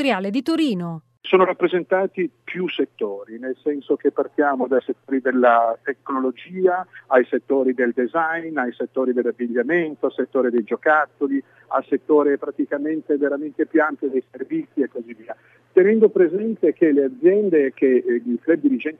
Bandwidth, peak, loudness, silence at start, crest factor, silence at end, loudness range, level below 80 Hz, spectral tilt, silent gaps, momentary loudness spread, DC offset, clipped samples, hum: 8.6 kHz; -2 dBFS; -20 LUFS; 0 s; 18 dB; 0.05 s; 5 LU; -80 dBFS; -7.5 dB/octave; none; 10 LU; under 0.1%; under 0.1%; none